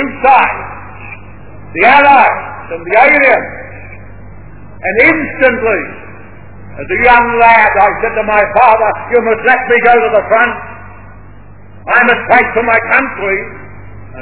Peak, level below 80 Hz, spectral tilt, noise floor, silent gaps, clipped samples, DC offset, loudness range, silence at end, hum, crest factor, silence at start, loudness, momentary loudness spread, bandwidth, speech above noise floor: 0 dBFS; -38 dBFS; -8 dB/octave; -35 dBFS; none; 1%; 2%; 4 LU; 0 s; none; 12 dB; 0 s; -9 LUFS; 21 LU; 4 kHz; 26 dB